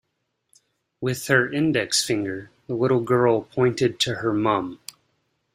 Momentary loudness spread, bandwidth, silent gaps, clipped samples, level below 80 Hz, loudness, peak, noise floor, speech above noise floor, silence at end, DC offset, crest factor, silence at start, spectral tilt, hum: 12 LU; 16 kHz; none; under 0.1%; -60 dBFS; -22 LUFS; -4 dBFS; -76 dBFS; 54 dB; 0.8 s; under 0.1%; 20 dB; 1 s; -4.5 dB/octave; none